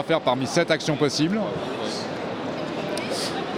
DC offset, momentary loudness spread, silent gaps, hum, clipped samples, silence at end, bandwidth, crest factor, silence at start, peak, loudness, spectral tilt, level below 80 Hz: under 0.1%; 8 LU; none; none; under 0.1%; 0 s; 16 kHz; 20 dB; 0 s; -6 dBFS; -25 LUFS; -4.5 dB/octave; -60 dBFS